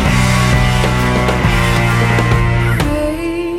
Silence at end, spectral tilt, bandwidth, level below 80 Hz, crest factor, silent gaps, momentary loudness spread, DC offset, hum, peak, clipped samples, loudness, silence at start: 0 s; -5.5 dB/octave; 15.5 kHz; -20 dBFS; 12 dB; none; 4 LU; under 0.1%; none; 0 dBFS; under 0.1%; -13 LUFS; 0 s